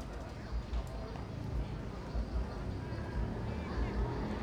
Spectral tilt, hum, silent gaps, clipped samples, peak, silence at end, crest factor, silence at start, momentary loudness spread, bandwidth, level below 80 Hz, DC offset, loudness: -7.5 dB/octave; none; none; under 0.1%; -24 dBFS; 0 s; 14 dB; 0 s; 6 LU; 9.8 kHz; -40 dBFS; under 0.1%; -40 LUFS